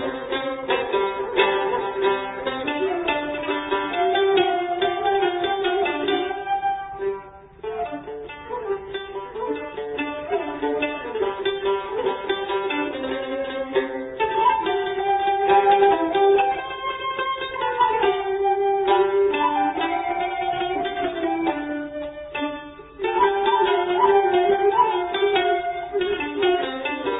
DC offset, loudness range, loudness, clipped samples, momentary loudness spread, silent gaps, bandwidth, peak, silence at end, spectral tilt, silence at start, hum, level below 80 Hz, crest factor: under 0.1%; 8 LU; -22 LUFS; under 0.1%; 11 LU; none; 4 kHz; -4 dBFS; 0 s; -8.5 dB/octave; 0 s; none; -54 dBFS; 18 dB